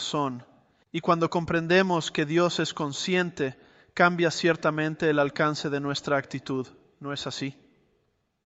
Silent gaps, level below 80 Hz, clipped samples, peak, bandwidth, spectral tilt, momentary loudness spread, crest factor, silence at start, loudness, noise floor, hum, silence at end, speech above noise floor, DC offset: none; -62 dBFS; under 0.1%; -6 dBFS; 8.2 kHz; -5 dB/octave; 12 LU; 22 dB; 0 s; -26 LUFS; -72 dBFS; none; 0.95 s; 46 dB; under 0.1%